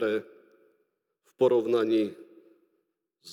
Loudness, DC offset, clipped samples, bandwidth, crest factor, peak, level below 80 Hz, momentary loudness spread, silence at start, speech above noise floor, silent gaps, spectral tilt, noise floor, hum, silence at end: -27 LUFS; under 0.1%; under 0.1%; 11.5 kHz; 18 dB; -12 dBFS; under -90 dBFS; 10 LU; 0 s; 52 dB; none; -6.5 dB/octave; -77 dBFS; none; 0 s